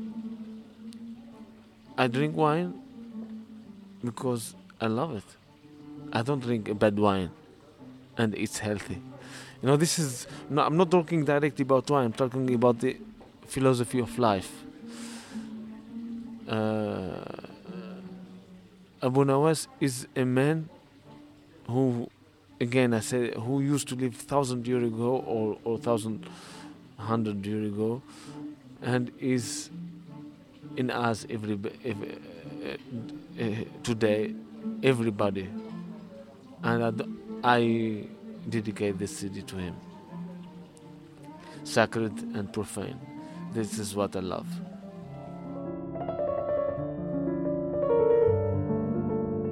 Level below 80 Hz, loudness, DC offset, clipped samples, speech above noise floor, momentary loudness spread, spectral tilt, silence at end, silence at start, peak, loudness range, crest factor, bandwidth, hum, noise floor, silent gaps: -62 dBFS; -29 LUFS; under 0.1%; under 0.1%; 25 dB; 20 LU; -6 dB/octave; 0 s; 0 s; -6 dBFS; 8 LU; 24 dB; 16 kHz; none; -52 dBFS; none